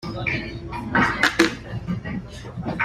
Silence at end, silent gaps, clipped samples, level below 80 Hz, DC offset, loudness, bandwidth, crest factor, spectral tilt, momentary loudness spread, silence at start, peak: 0 s; none; under 0.1%; -42 dBFS; under 0.1%; -23 LUFS; 15 kHz; 24 dB; -4.5 dB/octave; 14 LU; 0 s; 0 dBFS